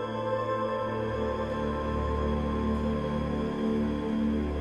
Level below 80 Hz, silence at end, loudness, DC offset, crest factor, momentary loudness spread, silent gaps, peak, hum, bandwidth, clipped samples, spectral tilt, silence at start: -38 dBFS; 0 s; -30 LUFS; under 0.1%; 12 dB; 2 LU; none; -18 dBFS; none; 9 kHz; under 0.1%; -8 dB/octave; 0 s